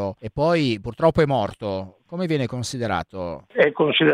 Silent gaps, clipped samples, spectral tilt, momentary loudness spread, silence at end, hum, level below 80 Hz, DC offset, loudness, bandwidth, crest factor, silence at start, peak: none; under 0.1%; -5.5 dB/octave; 12 LU; 0 s; none; -48 dBFS; under 0.1%; -22 LUFS; 13 kHz; 18 dB; 0 s; -2 dBFS